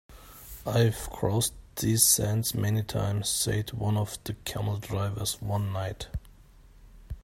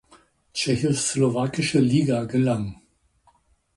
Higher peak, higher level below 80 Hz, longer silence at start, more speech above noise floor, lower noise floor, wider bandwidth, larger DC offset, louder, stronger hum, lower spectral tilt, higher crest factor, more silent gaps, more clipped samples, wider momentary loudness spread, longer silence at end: about the same, -8 dBFS vs -8 dBFS; first, -48 dBFS vs -54 dBFS; second, 0.1 s vs 0.55 s; second, 26 dB vs 40 dB; second, -54 dBFS vs -62 dBFS; first, 16.5 kHz vs 11.5 kHz; neither; second, -28 LUFS vs -23 LUFS; neither; about the same, -4 dB/octave vs -5 dB/octave; first, 22 dB vs 16 dB; neither; neither; first, 16 LU vs 8 LU; second, 0.05 s vs 1 s